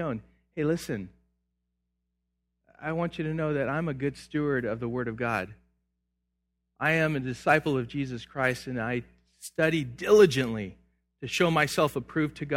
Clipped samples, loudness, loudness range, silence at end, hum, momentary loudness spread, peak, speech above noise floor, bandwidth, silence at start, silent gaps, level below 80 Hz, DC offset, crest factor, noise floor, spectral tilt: under 0.1%; -28 LUFS; 8 LU; 0 s; 60 Hz at -55 dBFS; 13 LU; -6 dBFS; 53 dB; 16 kHz; 0 s; none; -58 dBFS; under 0.1%; 22 dB; -80 dBFS; -5.5 dB/octave